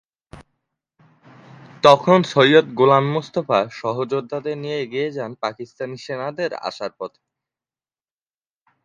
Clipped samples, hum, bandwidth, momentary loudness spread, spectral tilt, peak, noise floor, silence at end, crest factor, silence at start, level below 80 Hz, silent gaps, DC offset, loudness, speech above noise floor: under 0.1%; none; 10.5 kHz; 16 LU; -6 dB/octave; 0 dBFS; under -90 dBFS; 1.8 s; 20 dB; 0.35 s; -62 dBFS; none; under 0.1%; -19 LUFS; over 71 dB